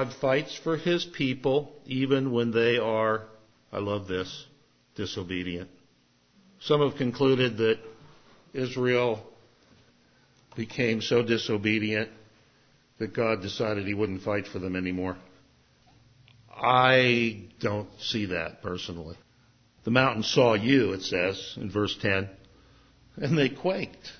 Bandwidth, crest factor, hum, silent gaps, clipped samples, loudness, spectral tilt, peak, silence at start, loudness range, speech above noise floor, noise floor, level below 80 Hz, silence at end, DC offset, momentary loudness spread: 6.6 kHz; 22 dB; none; none; under 0.1%; -27 LUFS; -5.5 dB/octave; -6 dBFS; 0 s; 5 LU; 38 dB; -65 dBFS; -56 dBFS; 0.05 s; under 0.1%; 14 LU